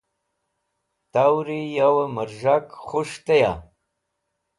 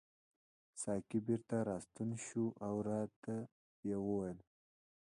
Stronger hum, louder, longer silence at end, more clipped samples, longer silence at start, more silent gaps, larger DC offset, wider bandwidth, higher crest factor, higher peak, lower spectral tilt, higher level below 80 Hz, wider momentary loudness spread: neither; first, -22 LUFS vs -42 LUFS; first, 0.95 s vs 0.6 s; neither; first, 1.15 s vs 0.75 s; second, none vs 3.16-3.22 s, 3.52-3.83 s; neither; about the same, 11.5 kHz vs 11 kHz; about the same, 18 dB vs 18 dB; first, -6 dBFS vs -24 dBFS; about the same, -6 dB/octave vs -7 dB/octave; first, -54 dBFS vs -72 dBFS; about the same, 8 LU vs 8 LU